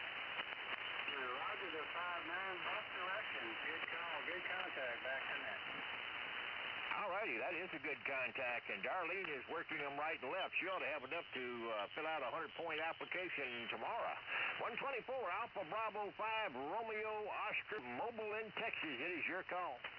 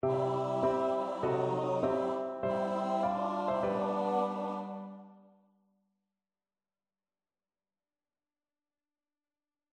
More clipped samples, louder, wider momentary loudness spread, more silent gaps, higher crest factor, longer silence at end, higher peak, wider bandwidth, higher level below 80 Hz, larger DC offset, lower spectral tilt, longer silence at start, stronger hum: neither; second, -43 LUFS vs -33 LUFS; second, 4 LU vs 7 LU; neither; about the same, 16 dB vs 16 dB; second, 0 s vs 4.55 s; second, -28 dBFS vs -18 dBFS; second, 5.4 kHz vs 9.8 kHz; second, -82 dBFS vs -70 dBFS; neither; second, 0 dB/octave vs -7.5 dB/octave; about the same, 0 s vs 0.05 s; neither